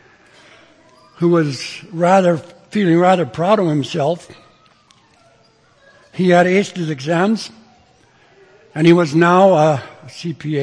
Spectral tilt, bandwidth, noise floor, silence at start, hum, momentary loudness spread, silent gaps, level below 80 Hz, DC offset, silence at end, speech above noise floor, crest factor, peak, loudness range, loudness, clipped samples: -6.5 dB/octave; 10.5 kHz; -53 dBFS; 1.2 s; none; 15 LU; none; -62 dBFS; under 0.1%; 0 s; 38 dB; 16 dB; 0 dBFS; 4 LU; -15 LUFS; under 0.1%